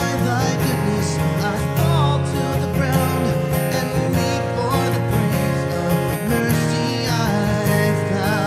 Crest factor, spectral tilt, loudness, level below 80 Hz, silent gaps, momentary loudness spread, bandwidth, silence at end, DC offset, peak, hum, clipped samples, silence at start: 14 dB; -6 dB/octave; -19 LUFS; -40 dBFS; none; 3 LU; 15.5 kHz; 0 s; under 0.1%; -6 dBFS; none; under 0.1%; 0 s